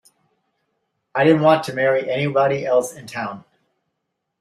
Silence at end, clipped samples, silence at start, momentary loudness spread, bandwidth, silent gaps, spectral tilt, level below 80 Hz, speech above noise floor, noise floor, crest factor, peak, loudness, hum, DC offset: 1 s; under 0.1%; 1.15 s; 14 LU; 15 kHz; none; -6 dB/octave; -64 dBFS; 59 dB; -77 dBFS; 20 dB; -2 dBFS; -19 LUFS; none; under 0.1%